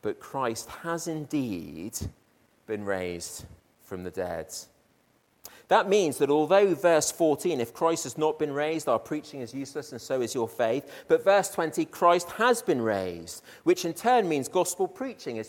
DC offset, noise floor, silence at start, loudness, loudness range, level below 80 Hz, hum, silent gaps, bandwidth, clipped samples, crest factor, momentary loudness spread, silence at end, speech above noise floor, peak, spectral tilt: under 0.1%; -67 dBFS; 0.05 s; -27 LUFS; 11 LU; -62 dBFS; none; none; 17.5 kHz; under 0.1%; 20 dB; 15 LU; 0 s; 40 dB; -8 dBFS; -4 dB/octave